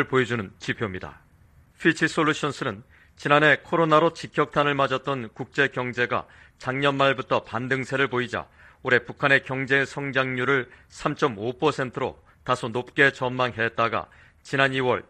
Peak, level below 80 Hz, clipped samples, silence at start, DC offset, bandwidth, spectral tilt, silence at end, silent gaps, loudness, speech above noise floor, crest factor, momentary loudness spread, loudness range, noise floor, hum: -2 dBFS; -58 dBFS; under 0.1%; 0 s; under 0.1%; 10.5 kHz; -5.5 dB/octave; 0.1 s; none; -24 LUFS; 32 dB; 22 dB; 11 LU; 3 LU; -56 dBFS; none